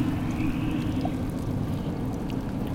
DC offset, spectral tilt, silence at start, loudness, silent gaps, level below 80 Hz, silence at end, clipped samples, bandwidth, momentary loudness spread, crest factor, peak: under 0.1%; -7.5 dB/octave; 0 s; -29 LUFS; none; -38 dBFS; 0 s; under 0.1%; 17 kHz; 3 LU; 14 dB; -14 dBFS